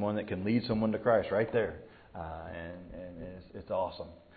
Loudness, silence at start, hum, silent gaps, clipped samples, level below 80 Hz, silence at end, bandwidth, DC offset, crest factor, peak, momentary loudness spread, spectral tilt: -32 LUFS; 0 s; none; none; under 0.1%; -56 dBFS; 0.2 s; 4.8 kHz; under 0.1%; 20 dB; -14 dBFS; 18 LU; -6 dB/octave